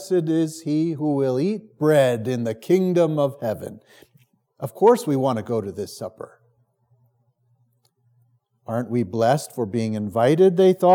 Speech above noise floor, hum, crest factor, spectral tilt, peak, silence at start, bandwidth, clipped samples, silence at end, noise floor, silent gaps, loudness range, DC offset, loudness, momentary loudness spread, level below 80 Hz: 45 dB; none; 18 dB; -7 dB/octave; -4 dBFS; 0 s; 17.5 kHz; under 0.1%; 0 s; -65 dBFS; none; 12 LU; under 0.1%; -21 LUFS; 16 LU; -74 dBFS